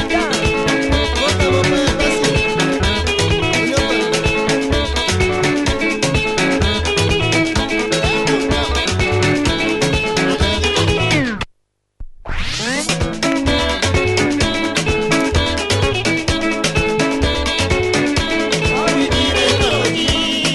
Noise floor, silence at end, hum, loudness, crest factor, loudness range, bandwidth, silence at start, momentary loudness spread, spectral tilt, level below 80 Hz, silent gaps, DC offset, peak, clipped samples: -61 dBFS; 0 s; none; -16 LUFS; 16 dB; 3 LU; 12 kHz; 0 s; 3 LU; -4 dB/octave; -26 dBFS; none; under 0.1%; 0 dBFS; under 0.1%